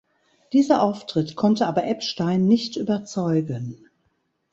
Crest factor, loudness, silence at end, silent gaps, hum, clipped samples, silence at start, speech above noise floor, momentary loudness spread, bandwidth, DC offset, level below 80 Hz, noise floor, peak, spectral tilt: 18 dB; -22 LUFS; 0.8 s; none; none; under 0.1%; 0.5 s; 49 dB; 7 LU; 8 kHz; under 0.1%; -62 dBFS; -70 dBFS; -4 dBFS; -6.5 dB/octave